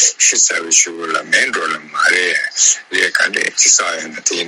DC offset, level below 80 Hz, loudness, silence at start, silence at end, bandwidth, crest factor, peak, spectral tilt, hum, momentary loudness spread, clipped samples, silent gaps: under 0.1%; -68 dBFS; -12 LUFS; 0 s; 0 s; 19 kHz; 16 dB; 0 dBFS; 1.5 dB/octave; none; 9 LU; under 0.1%; none